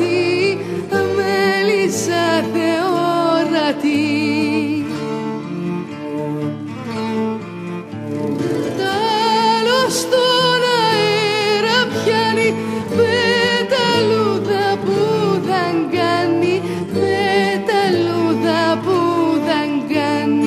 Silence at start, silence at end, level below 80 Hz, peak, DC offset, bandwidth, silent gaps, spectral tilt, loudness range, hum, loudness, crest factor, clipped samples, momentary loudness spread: 0 s; 0 s; -60 dBFS; -2 dBFS; under 0.1%; 15 kHz; none; -4.5 dB/octave; 7 LU; none; -17 LUFS; 14 dB; under 0.1%; 9 LU